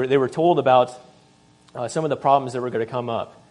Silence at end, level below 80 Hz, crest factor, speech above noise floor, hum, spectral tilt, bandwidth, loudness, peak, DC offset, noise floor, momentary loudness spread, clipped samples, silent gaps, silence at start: 0.25 s; -68 dBFS; 18 dB; 34 dB; none; -6 dB/octave; 10.5 kHz; -21 LUFS; -2 dBFS; under 0.1%; -55 dBFS; 12 LU; under 0.1%; none; 0 s